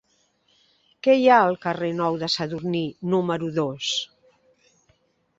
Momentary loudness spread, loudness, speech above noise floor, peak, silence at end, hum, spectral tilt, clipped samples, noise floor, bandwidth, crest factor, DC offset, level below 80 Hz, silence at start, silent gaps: 11 LU; -22 LUFS; 44 dB; -4 dBFS; 1.35 s; none; -5 dB/octave; under 0.1%; -66 dBFS; 7.8 kHz; 22 dB; under 0.1%; -64 dBFS; 1.05 s; none